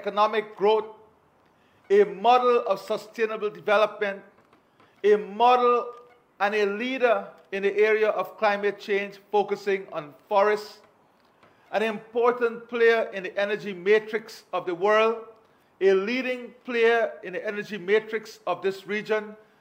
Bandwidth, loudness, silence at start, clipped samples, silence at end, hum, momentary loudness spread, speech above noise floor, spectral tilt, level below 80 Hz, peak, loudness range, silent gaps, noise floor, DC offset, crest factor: 16 kHz; -25 LUFS; 0 s; under 0.1%; 0.25 s; none; 11 LU; 37 dB; -5 dB/octave; -82 dBFS; -8 dBFS; 3 LU; none; -61 dBFS; under 0.1%; 18 dB